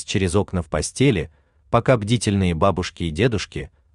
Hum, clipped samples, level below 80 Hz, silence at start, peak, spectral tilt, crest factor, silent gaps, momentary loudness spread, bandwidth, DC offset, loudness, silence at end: none; under 0.1%; -42 dBFS; 0 s; -4 dBFS; -5.5 dB/octave; 18 dB; none; 8 LU; 11 kHz; under 0.1%; -21 LUFS; 0.25 s